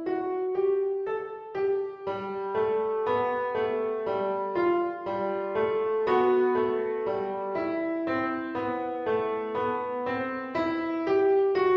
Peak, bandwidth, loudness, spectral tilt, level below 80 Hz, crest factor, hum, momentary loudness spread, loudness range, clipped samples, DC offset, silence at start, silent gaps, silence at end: -12 dBFS; 5.8 kHz; -28 LUFS; -7.5 dB/octave; -66 dBFS; 14 dB; none; 8 LU; 3 LU; under 0.1%; under 0.1%; 0 s; none; 0 s